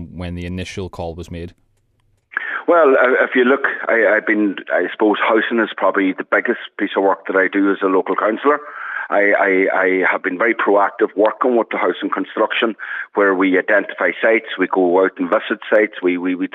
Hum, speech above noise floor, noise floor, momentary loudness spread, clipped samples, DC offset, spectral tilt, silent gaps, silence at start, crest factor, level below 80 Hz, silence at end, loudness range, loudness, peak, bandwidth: none; 45 dB; -61 dBFS; 12 LU; under 0.1%; under 0.1%; -6.5 dB/octave; none; 0 s; 14 dB; -52 dBFS; 0.05 s; 2 LU; -16 LUFS; -2 dBFS; 9.2 kHz